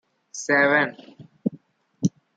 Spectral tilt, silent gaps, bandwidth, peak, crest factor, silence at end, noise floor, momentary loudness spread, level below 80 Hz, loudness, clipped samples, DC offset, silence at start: -5 dB/octave; none; 9.2 kHz; -6 dBFS; 20 dB; 0.3 s; -50 dBFS; 14 LU; -70 dBFS; -23 LUFS; under 0.1%; under 0.1%; 0.35 s